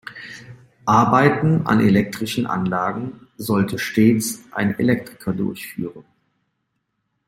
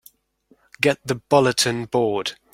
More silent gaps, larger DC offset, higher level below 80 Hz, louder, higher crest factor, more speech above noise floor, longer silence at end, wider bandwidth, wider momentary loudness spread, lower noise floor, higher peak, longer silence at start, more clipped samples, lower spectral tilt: neither; neither; about the same, -54 dBFS vs -58 dBFS; about the same, -19 LUFS vs -20 LUFS; about the same, 18 dB vs 20 dB; first, 55 dB vs 40 dB; first, 1.25 s vs 0.2 s; about the same, 16.5 kHz vs 16.5 kHz; first, 16 LU vs 7 LU; first, -74 dBFS vs -61 dBFS; about the same, -2 dBFS vs -2 dBFS; second, 0.05 s vs 0.8 s; neither; first, -6 dB/octave vs -4 dB/octave